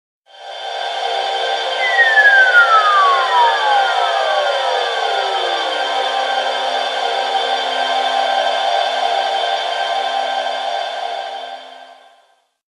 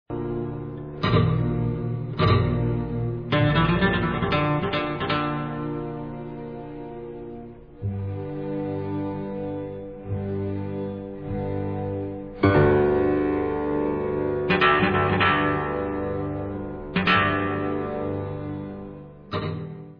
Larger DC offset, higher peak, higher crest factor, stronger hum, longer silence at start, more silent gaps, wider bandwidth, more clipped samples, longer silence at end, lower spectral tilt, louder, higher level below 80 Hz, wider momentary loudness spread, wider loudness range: second, under 0.1% vs 0.2%; first, 0 dBFS vs -4 dBFS; about the same, 16 dB vs 20 dB; neither; first, 0.35 s vs 0.1 s; neither; first, 12 kHz vs 5.4 kHz; neither; first, 0.8 s vs 0 s; second, 2.5 dB/octave vs -9 dB/octave; first, -15 LUFS vs -25 LUFS; second, -88 dBFS vs -42 dBFS; about the same, 13 LU vs 15 LU; about the same, 8 LU vs 10 LU